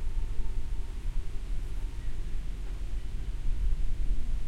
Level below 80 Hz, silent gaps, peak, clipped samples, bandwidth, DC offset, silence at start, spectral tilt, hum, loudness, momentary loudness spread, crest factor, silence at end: -30 dBFS; none; -16 dBFS; under 0.1%; 5.4 kHz; under 0.1%; 0 s; -6 dB/octave; none; -39 LUFS; 5 LU; 12 dB; 0 s